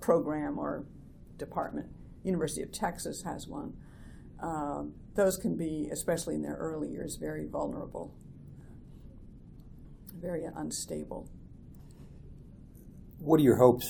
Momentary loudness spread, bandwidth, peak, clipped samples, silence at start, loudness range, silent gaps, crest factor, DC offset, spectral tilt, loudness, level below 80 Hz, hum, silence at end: 24 LU; 19.5 kHz; -8 dBFS; under 0.1%; 0 s; 8 LU; none; 26 dB; under 0.1%; -6 dB/octave; -33 LUFS; -52 dBFS; none; 0 s